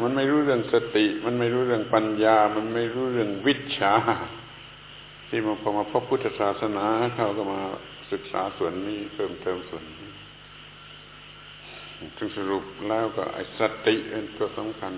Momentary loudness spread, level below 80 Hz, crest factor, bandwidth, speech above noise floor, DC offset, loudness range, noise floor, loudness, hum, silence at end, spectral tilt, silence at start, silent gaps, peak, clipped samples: 21 LU; -58 dBFS; 20 dB; 4 kHz; 21 dB; under 0.1%; 12 LU; -46 dBFS; -26 LUFS; 50 Hz at -55 dBFS; 0 s; -9.5 dB/octave; 0 s; none; -6 dBFS; under 0.1%